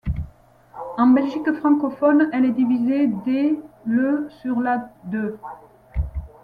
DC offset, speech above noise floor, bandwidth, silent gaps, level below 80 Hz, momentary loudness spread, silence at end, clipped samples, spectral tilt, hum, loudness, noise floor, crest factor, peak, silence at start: under 0.1%; 29 dB; 4.9 kHz; none; -38 dBFS; 14 LU; 0.15 s; under 0.1%; -9.5 dB/octave; none; -21 LUFS; -49 dBFS; 14 dB; -6 dBFS; 0.05 s